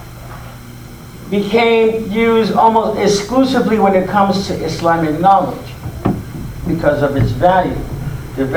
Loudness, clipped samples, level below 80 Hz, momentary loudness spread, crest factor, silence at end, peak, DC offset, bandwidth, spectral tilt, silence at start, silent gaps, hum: -14 LUFS; under 0.1%; -34 dBFS; 20 LU; 14 dB; 0 s; 0 dBFS; under 0.1%; over 20 kHz; -6 dB/octave; 0 s; none; none